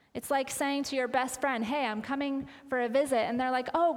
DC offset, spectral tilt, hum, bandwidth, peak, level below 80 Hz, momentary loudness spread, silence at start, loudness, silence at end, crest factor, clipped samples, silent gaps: under 0.1%; -3.5 dB/octave; none; 18.5 kHz; -14 dBFS; -66 dBFS; 5 LU; 0.15 s; -30 LUFS; 0 s; 16 dB; under 0.1%; none